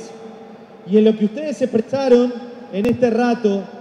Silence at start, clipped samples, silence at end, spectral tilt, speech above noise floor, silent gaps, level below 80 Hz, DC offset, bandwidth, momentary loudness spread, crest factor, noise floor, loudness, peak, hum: 0 s; under 0.1%; 0 s; -7 dB/octave; 23 dB; none; -56 dBFS; under 0.1%; 10 kHz; 20 LU; 16 dB; -39 dBFS; -18 LUFS; -2 dBFS; none